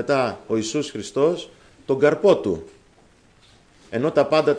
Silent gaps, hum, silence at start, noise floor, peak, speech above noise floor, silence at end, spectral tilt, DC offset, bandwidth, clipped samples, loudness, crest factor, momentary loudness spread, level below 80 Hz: none; none; 0 s; -55 dBFS; -6 dBFS; 34 dB; 0 s; -5.5 dB/octave; under 0.1%; 10.5 kHz; under 0.1%; -21 LUFS; 16 dB; 13 LU; -58 dBFS